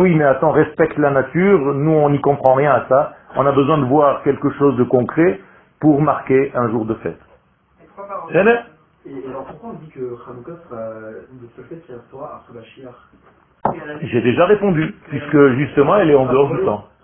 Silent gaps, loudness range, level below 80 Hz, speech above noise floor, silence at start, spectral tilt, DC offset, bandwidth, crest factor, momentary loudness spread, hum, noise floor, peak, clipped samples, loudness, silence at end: none; 17 LU; -50 dBFS; 38 dB; 0 s; -11.5 dB/octave; under 0.1%; 3.5 kHz; 16 dB; 20 LU; none; -54 dBFS; 0 dBFS; under 0.1%; -15 LUFS; 0.2 s